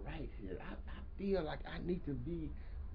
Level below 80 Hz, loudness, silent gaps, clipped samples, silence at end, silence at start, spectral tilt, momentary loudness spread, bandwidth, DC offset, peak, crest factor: -48 dBFS; -44 LUFS; none; under 0.1%; 0 s; 0 s; -6.5 dB/octave; 11 LU; 5.2 kHz; under 0.1%; -26 dBFS; 16 dB